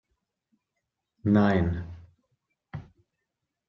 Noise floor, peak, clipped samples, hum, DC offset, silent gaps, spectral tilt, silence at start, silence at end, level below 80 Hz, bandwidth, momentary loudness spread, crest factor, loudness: -84 dBFS; -10 dBFS; under 0.1%; none; under 0.1%; none; -9.5 dB/octave; 1.25 s; 0.85 s; -54 dBFS; 5.8 kHz; 22 LU; 22 dB; -25 LUFS